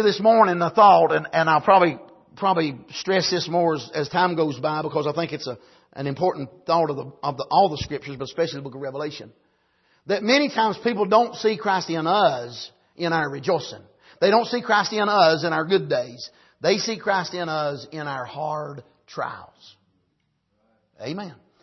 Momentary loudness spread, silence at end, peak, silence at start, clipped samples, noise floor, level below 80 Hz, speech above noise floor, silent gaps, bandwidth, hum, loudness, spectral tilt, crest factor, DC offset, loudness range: 16 LU; 0.3 s; -4 dBFS; 0 s; under 0.1%; -71 dBFS; -62 dBFS; 50 dB; none; 6.2 kHz; none; -22 LUFS; -5 dB/octave; 20 dB; under 0.1%; 7 LU